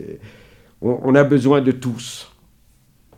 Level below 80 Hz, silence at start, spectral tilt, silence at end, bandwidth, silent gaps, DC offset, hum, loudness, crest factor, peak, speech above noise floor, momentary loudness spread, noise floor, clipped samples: -56 dBFS; 0 s; -7 dB/octave; 0.95 s; 14 kHz; none; under 0.1%; none; -17 LUFS; 18 dB; -2 dBFS; 37 dB; 21 LU; -55 dBFS; under 0.1%